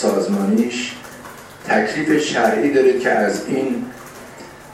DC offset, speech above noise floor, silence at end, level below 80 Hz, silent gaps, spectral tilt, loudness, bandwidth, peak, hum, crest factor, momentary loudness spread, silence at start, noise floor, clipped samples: under 0.1%; 21 dB; 0 s; -58 dBFS; none; -5 dB/octave; -18 LUFS; 15.5 kHz; -2 dBFS; none; 16 dB; 21 LU; 0 s; -38 dBFS; under 0.1%